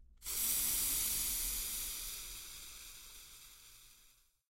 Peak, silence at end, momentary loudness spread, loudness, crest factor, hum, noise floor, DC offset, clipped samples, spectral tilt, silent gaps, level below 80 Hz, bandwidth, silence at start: -22 dBFS; 0.4 s; 22 LU; -35 LUFS; 20 dB; none; -68 dBFS; under 0.1%; under 0.1%; 0.5 dB/octave; none; -56 dBFS; 16.5 kHz; 0 s